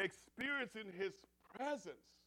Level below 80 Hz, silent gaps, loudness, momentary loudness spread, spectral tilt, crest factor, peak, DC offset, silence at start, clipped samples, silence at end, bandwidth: -80 dBFS; none; -44 LUFS; 16 LU; -4 dB/octave; 18 dB; -28 dBFS; under 0.1%; 0 s; under 0.1%; 0.3 s; 17 kHz